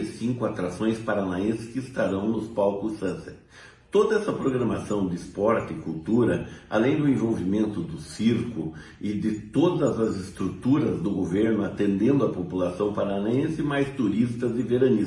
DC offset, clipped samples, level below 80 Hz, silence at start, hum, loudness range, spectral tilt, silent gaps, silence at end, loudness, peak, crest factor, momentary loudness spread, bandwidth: under 0.1%; under 0.1%; -56 dBFS; 0 s; none; 2 LU; -7.5 dB/octave; none; 0 s; -26 LUFS; -8 dBFS; 16 dB; 9 LU; 11.5 kHz